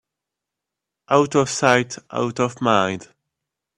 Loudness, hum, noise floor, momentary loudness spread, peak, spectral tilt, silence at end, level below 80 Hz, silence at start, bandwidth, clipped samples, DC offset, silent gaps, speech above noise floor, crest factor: -20 LUFS; none; -84 dBFS; 8 LU; 0 dBFS; -4.5 dB/octave; 0.75 s; -60 dBFS; 1.1 s; 12 kHz; under 0.1%; under 0.1%; none; 65 dB; 22 dB